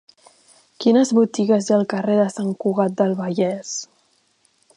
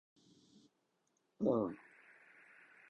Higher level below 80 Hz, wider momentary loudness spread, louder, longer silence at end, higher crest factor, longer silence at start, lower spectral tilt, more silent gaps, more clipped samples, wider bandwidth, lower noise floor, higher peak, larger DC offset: first, -70 dBFS vs -78 dBFS; second, 7 LU vs 26 LU; first, -20 LUFS vs -38 LUFS; second, 0.95 s vs 1.1 s; second, 16 dB vs 22 dB; second, 0.8 s vs 1.4 s; second, -6 dB/octave vs -9 dB/octave; neither; neither; first, 10.5 kHz vs 8 kHz; second, -62 dBFS vs -81 dBFS; first, -4 dBFS vs -22 dBFS; neither